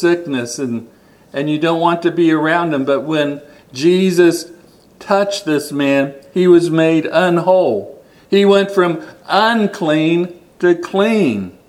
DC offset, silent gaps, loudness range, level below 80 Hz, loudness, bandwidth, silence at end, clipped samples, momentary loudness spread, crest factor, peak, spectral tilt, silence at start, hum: under 0.1%; none; 3 LU; -62 dBFS; -15 LUFS; 13.5 kHz; 0.2 s; under 0.1%; 11 LU; 14 dB; 0 dBFS; -5.5 dB/octave; 0 s; none